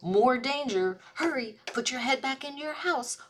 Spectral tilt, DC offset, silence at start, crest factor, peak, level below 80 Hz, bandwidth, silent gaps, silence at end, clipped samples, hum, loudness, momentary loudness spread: -3 dB/octave; under 0.1%; 0 s; 16 dB; -12 dBFS; -72 dBFS; 14.5 kHz; none; 0.05 s; under 0.1%; none; -29 LUFS; 10 LU